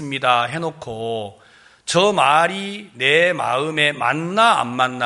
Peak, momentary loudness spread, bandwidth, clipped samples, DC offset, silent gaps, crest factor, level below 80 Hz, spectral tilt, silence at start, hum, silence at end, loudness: -2 dBFS; 13 LU; 11.5 kHz; under 0.1%; under 0.1%; none; 18 dB; -62 dBFS; -3.5 dB/octave; 0 s; none; 0 s; -18 LUFS